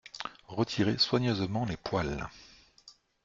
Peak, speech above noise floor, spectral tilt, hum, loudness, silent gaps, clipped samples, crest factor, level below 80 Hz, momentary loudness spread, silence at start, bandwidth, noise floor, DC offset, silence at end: -14 dBFS; 29 dB; -5.5 dB/octave; none; -31 LUFS; none; under 0.1%; 20 dB; -54 dBFS; 14 LU; 0.15 s; 7.6 kHz; -59 dBFS; under 0.1%; 0.35 s